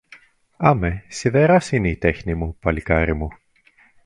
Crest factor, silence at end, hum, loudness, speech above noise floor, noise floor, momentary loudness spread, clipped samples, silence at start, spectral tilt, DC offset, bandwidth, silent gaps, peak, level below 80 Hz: 20 dB; 0.7 s; none; -20 LUFS; 37 dB; -56 dBFS; 10 LU; under 0.1%; 0.6 s; -7 dB/octave; under 0.1%; 11.5 kHz; none; 0 dBFS; -34 dBFS